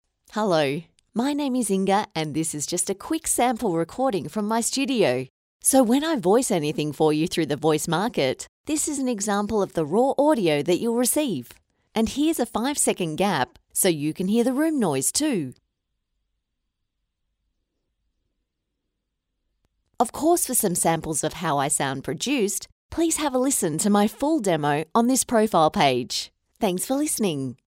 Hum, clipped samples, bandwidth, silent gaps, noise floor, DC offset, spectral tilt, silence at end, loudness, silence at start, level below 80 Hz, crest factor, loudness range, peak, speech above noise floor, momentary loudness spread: none; under 0.1%; 16 kHz; 5.30-5.60 s, 8.49-8.64 s, 22.72-22.89 s; -80 dBFS; under 0.1%; -4 dB/octave; 0.15 s; -23 LUFS; 0.35 s; -56 dBFS; 18 dB; 4 LU; -6 dBFS; 57 dB; 7 LU